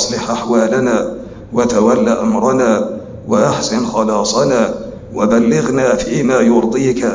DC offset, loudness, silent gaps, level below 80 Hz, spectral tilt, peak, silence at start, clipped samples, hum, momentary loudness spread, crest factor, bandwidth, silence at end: under 0.1%; -14 LUFS; none; -42 dBFS; -5 dB/octave; -2 dBFS; 0 s; under 0.1%; none; 8 LU; 12 dB; 7.6 kHz; 0 s